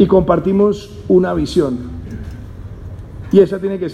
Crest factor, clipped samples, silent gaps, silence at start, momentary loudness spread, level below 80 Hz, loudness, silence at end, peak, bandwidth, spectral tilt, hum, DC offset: 16 dB; under 0.1%; none; 0 s; 20 LU; -34 dBFS; -15 LUFS; 0 s; 0 dBFS; 10 kHz; -8 dB/octave; none; under 0.1%